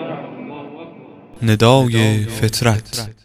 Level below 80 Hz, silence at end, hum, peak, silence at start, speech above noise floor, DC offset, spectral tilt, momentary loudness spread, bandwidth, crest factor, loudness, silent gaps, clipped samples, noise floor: -44 dBFS; 0.1 s; none; 0 dBFS; 0 s; 24 dB; under 0.1%; -5.5 dB/octave; 22 LU; 15.5 kHz; 18 dB; -16 LUFS; none; under 0.1%; -39 dBFS